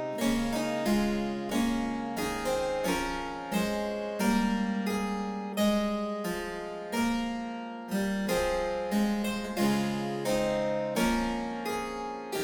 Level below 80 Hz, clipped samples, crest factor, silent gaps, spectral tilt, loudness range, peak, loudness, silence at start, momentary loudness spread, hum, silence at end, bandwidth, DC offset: -48 dBFS; under 0.1%; 16 dB; none; -5 dB/octave; 2 LU; -14 dBFS; -30 LUFS; 0 s; 6 LU; none; 0 s; over 20 kHz; under 0.1%